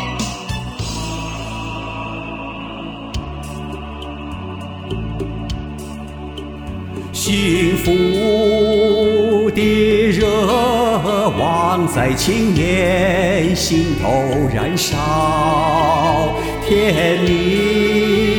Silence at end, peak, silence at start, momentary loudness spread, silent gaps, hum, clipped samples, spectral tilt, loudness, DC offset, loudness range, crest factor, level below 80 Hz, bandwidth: 0 s; -2 dBFS; 0 s; 14 LU; none; none; under 0.1%; -5 dB/octave; -16 LUFS; under 0.1%; 13 LU; 14 dB; -32 dBFS; 19.5 kHz